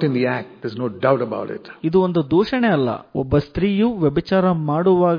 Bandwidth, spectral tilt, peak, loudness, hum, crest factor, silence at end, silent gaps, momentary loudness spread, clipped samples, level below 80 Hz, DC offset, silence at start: 5.2 kHz; -9.5 dB/octave; -4 dBFS; -19 LUFS; none; 16 dB; 0 s; none; 9 LU; under 0.1%; -44 dBFS; under 0.1%; 0 s